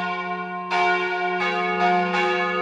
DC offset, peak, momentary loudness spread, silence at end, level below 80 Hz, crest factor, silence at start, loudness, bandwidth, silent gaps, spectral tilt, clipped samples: under 0.1%; -8 dBFS; 7 LU; 0 s; -68 dBFS; 14 dB; 0 s; -22 LUFS; 10 kHz; none; -5 dB/octave; under 0.1%